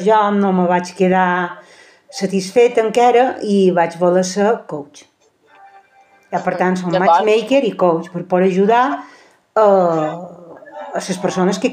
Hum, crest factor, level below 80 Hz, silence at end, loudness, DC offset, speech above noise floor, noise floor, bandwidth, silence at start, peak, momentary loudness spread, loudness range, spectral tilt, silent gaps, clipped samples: none; 14 dB; -66 dBFS; 0 s; -15 LUFS; under 0.1%; 38 dB; -52 dBFS; 10 kHz; 0 s; -2 dBFS; 13 LU; 4 LU; -6 dB/octave; none; under 0.1%